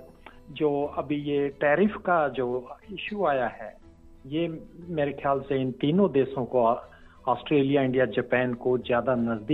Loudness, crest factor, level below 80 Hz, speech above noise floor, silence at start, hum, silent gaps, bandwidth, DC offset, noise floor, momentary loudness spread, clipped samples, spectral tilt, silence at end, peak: -26 LUFS; 16 dB; -56 dBFS; 23 dB; 0 s; none; none; 4.4 kHz; under 0.1%; -48 dBFS; 11 LU; under 0.1%; -9 dB/octave; 0 s; -10 dBFS